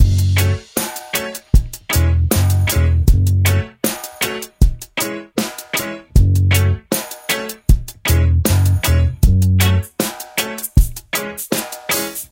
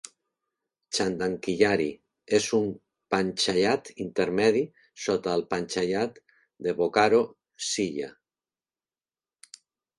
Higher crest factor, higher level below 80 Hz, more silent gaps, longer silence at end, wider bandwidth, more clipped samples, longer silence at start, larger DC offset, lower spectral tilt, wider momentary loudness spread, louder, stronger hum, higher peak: second, 16 dB vs 22 dB; first, -20 dBFS vs -64 dBFS; neither; second, 0.05 s vs 1.9 s; first, 17.5 kHz vs 11.5 kHz; neither; second, 0 s vs 0.9 s; neither; about the same, -4.5 dB/octave vs -4 dB/octave; second, 8 LU vs 11 LU; first, -17 LUFS vs -27 LUFS; neither; first, 0 dBFS vs -6 dBFS